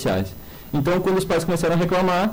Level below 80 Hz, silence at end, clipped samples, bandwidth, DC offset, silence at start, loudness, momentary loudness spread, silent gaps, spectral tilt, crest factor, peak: -42 dBFS; 0 s; under 0.1%; 16.5 kHz; under 0.1%; 0 s; -21 LUFS; 9 LU; none; -6 dB/octave; 8 dB; -14 dBFS